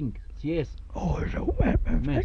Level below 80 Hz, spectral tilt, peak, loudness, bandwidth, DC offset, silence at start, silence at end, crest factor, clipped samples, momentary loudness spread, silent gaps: -30 dBFS; -8.5 dB/octave; -12 dBFS; -29 LUFS; 6.8 kHz; under 0.1%; 0 s; 0 s; 16 dB; under 0.1%; 10 LU; none